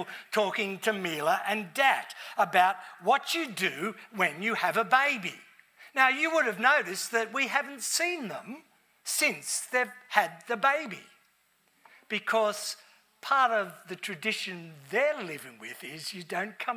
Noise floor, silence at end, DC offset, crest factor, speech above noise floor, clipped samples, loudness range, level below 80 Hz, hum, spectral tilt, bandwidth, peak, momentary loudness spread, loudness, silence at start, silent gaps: -69 dBFS; 0 s; under 0.1%; 24 dB; 40 dB; under 0.1%; 4 LU; under -90 dBFS; none; -2 dB/octave; 16 kHz; -6 dBFS; 15 LU; -28 LUFS; 0 s; none